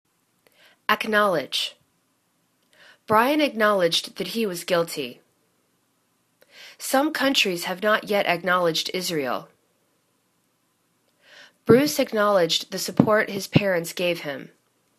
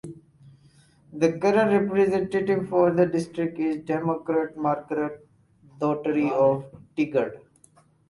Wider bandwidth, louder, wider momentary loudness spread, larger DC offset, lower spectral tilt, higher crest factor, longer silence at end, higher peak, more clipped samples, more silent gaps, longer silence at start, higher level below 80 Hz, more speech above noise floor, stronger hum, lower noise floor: first, 14 kHz vs 11.5 kHz; about the same, -22 LUFS vs -24 LUFS; about the same, 11 LU vs 9 LU; neither; second, -4 dB/octave vs -7.5 dB/octave; first, 24 dB vs 18 dB; second, 0.5 s vs 0.7 s; first, 0 dBFS vs -6 dBFS; neither; neither; first, 0.9 s vs 0.05 s; about the same, -66 dBFS vs -62 dBFS; first, 47 dB vs 35 dB; neither; first, -69 dBFS vs -59 dBFS